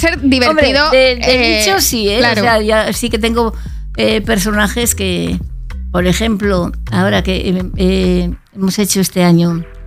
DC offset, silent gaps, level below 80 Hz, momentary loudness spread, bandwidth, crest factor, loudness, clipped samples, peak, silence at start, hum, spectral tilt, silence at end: under 0.1%; none; -26 dBFS; 9 LU; 16.5 kHz; 12 dB; -13 LUFS; under 0.1%; 0 dBFS; 0 s; none; -4 dB/octave; 0 s